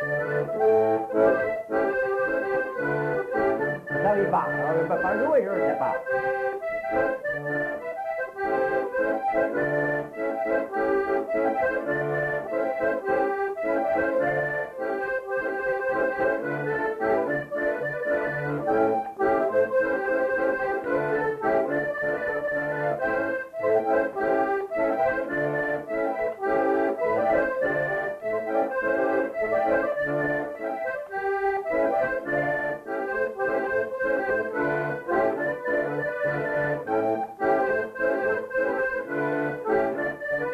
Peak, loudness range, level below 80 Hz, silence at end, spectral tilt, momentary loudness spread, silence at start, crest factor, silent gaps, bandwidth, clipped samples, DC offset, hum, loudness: -10 dBFS; 2 LU; -58 dBFS; 0 s; -7.5 dB/octave; 5 LU; 0 s; 16 dB; none; 13.5 kHz; under 0.1%; under 0.1%; none; -26 LUFS